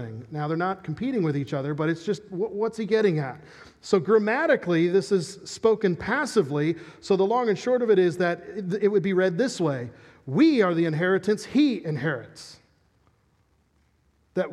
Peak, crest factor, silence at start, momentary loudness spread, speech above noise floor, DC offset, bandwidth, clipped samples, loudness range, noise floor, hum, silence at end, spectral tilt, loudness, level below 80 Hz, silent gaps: -8 dBFS; 18 dB; 0 s; 12 LU; 42 dB; under 0.1%; 12 kHz; under 0.1%; 4 LU; -66 dBFS; none; 0 s; -6.5 dB/octave; -24 LUFS; -64 dBFS; none